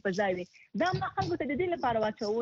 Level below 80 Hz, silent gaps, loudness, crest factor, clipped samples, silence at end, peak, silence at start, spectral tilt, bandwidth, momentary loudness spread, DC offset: -60 dBFS; none; -31 LUFS; 14 dB; under 0.1%; 0 s; -16 dBFS; 0.05 s; -6 dB/octave; 7.6 kHz; 3 LU; under 0.1%